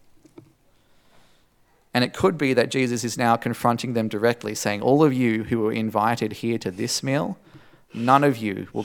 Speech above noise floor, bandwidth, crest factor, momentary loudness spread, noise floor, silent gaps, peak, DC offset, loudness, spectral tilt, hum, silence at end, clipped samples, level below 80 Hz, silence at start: 38 dB; 18 kHz; 22 dB; 9 LU; -60 dBFS; none; -2 dBFS; under 0.1%; -22 LUFS; -5 dB/octave; none; 0 s; under 0.1%; -62 dBFS; 1.95 s